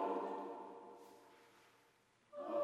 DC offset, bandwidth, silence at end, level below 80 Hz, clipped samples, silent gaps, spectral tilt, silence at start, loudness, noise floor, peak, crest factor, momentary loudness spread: under 0.1%; 13 kHz; 0 s; under -90 dBFS; under 0.1%; none; -6 dB/octave; 0 s; -47 LUFS; -74 dBFS; -28 dBFS; 18 dB; 23 LU